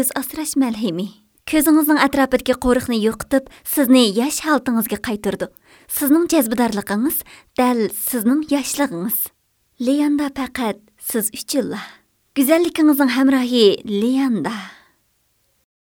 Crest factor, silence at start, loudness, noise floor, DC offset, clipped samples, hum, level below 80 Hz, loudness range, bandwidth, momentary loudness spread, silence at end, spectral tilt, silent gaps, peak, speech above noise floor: 18 dB; 0 s; -18 LUFS; -64 dBFS; under 0.1%; under 0.1%; none; -48 dBFS; 4 LU; over 20 kHz; 12 LU; 1.25 s; -3.5 dB/octave; none; 0 dBFS; 46 dB